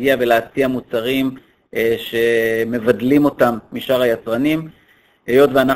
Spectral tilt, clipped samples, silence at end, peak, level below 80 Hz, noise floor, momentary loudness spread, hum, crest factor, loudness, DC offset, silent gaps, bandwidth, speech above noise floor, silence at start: -6 dB/octave; under 0.1%; 0 s; 0 dBFS; -50 dBFS; -54 dBFS; 9 LU; none; 16 dB; -17 LUFS; under 0.1%; none; 16 kHz; 38 dB; 0 s